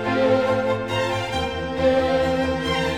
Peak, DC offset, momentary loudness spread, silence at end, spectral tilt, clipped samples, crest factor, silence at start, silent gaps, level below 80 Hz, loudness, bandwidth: -8 dBFS; 0.3%; 6 LU; 0 s; -5.5 dB/octave; under 0.1%; 14 dB; 0 s; none; -40 dBFS; -21 LUFS; 13 kHz